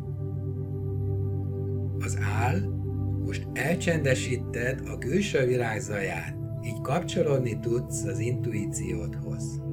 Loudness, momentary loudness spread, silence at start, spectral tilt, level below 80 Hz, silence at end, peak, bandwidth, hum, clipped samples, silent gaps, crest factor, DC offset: -29 LUFS; 8 LU; 0 s; -6 dB/octave; -46 dBFS; 0 s; -10 dBFS; 16 kHz; none; under 0.1%; none; 18 dB; under 0.1%